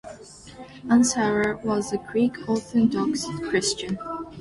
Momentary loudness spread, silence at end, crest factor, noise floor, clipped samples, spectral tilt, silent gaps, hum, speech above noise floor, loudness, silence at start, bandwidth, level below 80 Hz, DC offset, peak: 22 LU; 0 s; 16 dB; -44 dBFS; under 0.1%; -4 dB/octave; none; none; 21 dB; -24 LUFS; 0.05 s; 11.5 kHz; -54 dBFS; under 0.1%; -8 dBFS